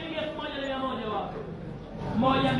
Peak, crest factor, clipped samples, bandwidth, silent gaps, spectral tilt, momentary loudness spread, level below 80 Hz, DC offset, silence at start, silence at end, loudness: -10 dBFS; 18 dB; under 0.1%; 11 kHz; none; -7 dB/octave; 13 LU; -50 dBFS; under 0.1%; 0 s; 0 s; -31 LUFS